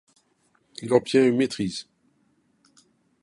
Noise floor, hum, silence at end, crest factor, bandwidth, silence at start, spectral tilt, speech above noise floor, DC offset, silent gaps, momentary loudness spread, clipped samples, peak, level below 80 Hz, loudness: -67 dBFS; none; 1.4 s; 22 dB; 11.5 kHz; 0.8 s; -5.5 dB/octave; 45 dB; under 0.1%; none; 18 LU; under 0.1%; -6 dBFS; -64 dBFS; -23 LUFS